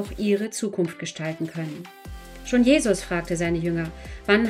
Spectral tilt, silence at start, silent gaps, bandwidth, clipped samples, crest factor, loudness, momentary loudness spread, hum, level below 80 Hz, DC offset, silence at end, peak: -5 dB/octave; 0 s; none; 15.5 kHz; under 0.1%; 18 dB; -25 LUFS; 20 LU; none; -44 dBFS; under 0.1%; 0 s; -6 dBFS